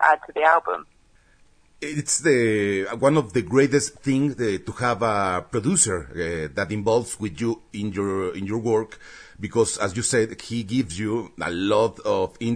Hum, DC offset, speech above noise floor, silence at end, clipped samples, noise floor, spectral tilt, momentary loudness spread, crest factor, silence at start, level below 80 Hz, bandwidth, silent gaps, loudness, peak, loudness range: none; under 0.1%; 33 dB; 0 s; under 0.1%; -56 dBFS; -4.5 dB/octave; 10 LU; 20 dB; 0 s; -52 dBFS; 11 kHz; none; -23 LUFS; -4 dBFS; 4 LU